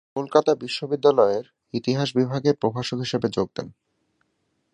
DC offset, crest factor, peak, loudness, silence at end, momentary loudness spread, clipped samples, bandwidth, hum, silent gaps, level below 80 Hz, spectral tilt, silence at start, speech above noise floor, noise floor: under 0.1%; 22 dB; -2 dBFS; -23 LUFS; 1.05 s; 10 LU; under 0.1%; 9.6 kHz; none; none; -62 dBFS; -6 dB/octave; 0.15 s; 50 dB; -72 dBFS